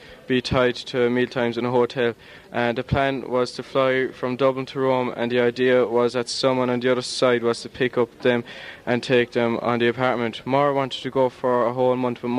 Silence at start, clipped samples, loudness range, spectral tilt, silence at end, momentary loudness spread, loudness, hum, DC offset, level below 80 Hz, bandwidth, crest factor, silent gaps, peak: 0 s; under 0.1%; 2 LU; -5.5 dB/octave; 0 s; 5 LU; -22 LUFS; none; under 0.1%; -52 dBFS; 11.5 kHz; 18 dB; none; -4 dBFS